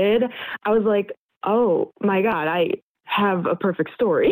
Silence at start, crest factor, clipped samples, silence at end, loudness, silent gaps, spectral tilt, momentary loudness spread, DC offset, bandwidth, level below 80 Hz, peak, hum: 0 s; 10 dB; under 0.1%; 0 s; -22 LUFS; 1.17-1.29 s, 1.37-1.41 s, 2.82-2.95 s; -10 dB/octave; 7 LU; under 0.1%; 15 kHz; -60 dBFS; -10 dBFS; none